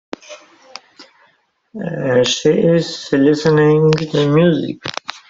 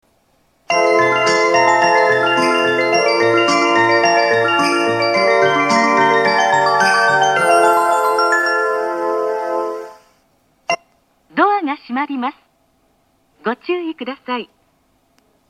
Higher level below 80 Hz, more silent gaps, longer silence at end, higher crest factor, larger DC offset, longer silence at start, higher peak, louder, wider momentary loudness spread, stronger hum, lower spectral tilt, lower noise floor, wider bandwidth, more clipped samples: first, -54 dBFS vs -66 dBFS; neither; second, 0.15 s vs 1.05 s; about the same, 14 dB vs 16 dB; neither; second, 0.3 s vs 0.7 s; about the same, -2 dBFS vs 0 dBFS; about the same, -15 LUFS vs -15 LUFS; first, 17 LU vs 11 LU; neither; first, -6 dB/octave vs -3.5 dB/octave; about the same, -57 dBFS vs -60 dBFS; second, 7.8 kHz vs 14.5 kHz; neither